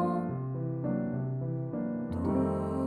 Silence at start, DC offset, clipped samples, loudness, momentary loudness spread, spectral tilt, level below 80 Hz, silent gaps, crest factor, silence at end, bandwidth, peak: 0 s; under 0.1%; under 0.1%; -33 LUFS; 5 LU; -10.5 dB/octave; -54 dBFS; none; 14 dB; 0 s; 9.6 kHz; -18 dBFS